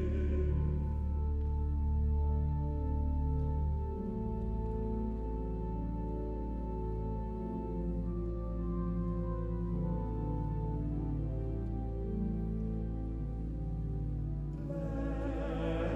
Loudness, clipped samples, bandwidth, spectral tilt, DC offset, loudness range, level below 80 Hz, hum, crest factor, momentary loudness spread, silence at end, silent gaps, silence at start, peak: -37 LUFS; under 0.1%; 3.7 kHz; -10.5 dB/octave; under 0.1%; 4 LU; -36 dBFS; none; 12 dB; 6 LU; 0 s; none; 0 s; -22 dBFS